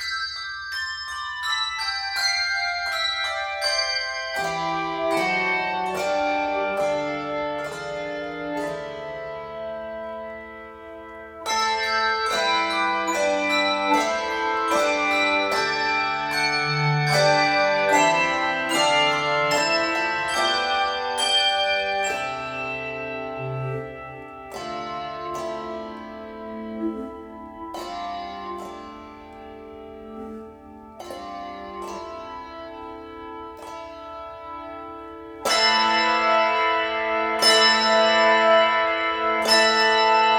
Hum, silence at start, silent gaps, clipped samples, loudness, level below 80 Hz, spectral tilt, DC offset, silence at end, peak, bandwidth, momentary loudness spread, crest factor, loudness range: none; 0 s; none; under 0.1%; -22 LUFS; -56 dBFS; -2.5 dB/octave; under 0.1%; 0 s; -4 dBFS; 19 kHz; 20 LU; 20 dB; 18 LU